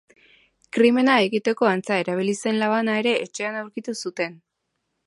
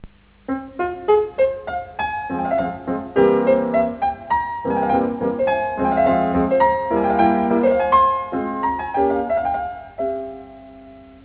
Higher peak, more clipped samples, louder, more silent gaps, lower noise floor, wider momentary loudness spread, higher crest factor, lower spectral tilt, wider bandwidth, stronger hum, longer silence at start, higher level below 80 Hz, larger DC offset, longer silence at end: about the same, -4 dBFS vs -4 dBFS; neither; about the same, -22 LUFS vs -20 LUFS; neither; first, -77 dBFS vs -42 dBFS; about the same, 12 LU vs 11 LU; about the same, 18 dB vs 16 dB; second, -4.5 dB/octave vs -10.5 dB/octave; first, 11.5 kHz vs 4 kHz; neither; first, 0.75 s vs 0.05 s; second, -74 dBFS vs -44 dBFS; neither; first, 0.7 s vs 0.15 s